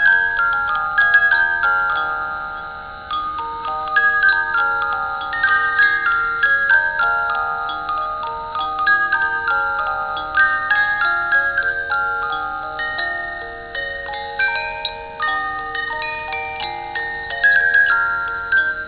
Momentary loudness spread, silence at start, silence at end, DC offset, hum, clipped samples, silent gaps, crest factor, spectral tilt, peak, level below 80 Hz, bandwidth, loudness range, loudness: 11 LU; 0 s; 0 s; under 0.1%; none; under 0.1%; none; 16 dB; -5.5 dB/octave; -4 dBFS; -46 dBFS; 4 kHz; 6 LU; -18 LUFS